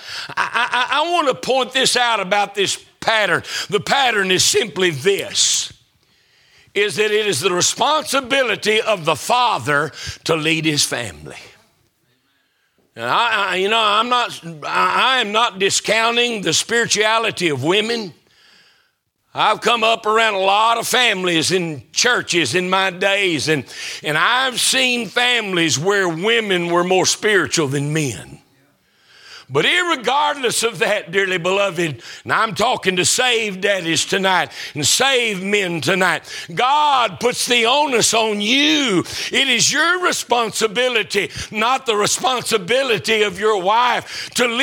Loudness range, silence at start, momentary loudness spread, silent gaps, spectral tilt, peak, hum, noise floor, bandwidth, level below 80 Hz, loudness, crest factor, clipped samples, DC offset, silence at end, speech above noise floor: 4 LU; 0 s; 7 LU; none; -2 dB/octave; 0 dBFS; none; -65 dBFS; 18.5 kHz; -58 dBFS; -16 LUFS; 18 dB; under 0.1%; under 0.1%; 0 s; 48 dB